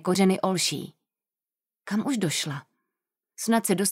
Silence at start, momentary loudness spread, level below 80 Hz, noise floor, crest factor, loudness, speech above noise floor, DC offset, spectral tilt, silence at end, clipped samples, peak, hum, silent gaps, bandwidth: 0.05 s; 15 LU; -76 dBFS; under -90 dBFS; 18 dB; -26 LUFS; over 65 dB; under 0.1%; -4 dB/octave; 0 s; under 0.1%; -10 dBFS; none; none; 16 kHz